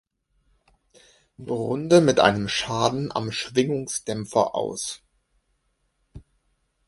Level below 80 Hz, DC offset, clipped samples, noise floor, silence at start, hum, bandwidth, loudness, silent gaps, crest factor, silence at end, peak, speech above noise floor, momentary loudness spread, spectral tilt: -56 dBFS; under 0.1%; under 0.1%; -71 dBFS; 1.4 s; none; 11.5 kHz; -23 LUFS; none; 24 dB; 0.7 s; -2 dBFS; 49 dB; 14 LU; -4.5 dB/octave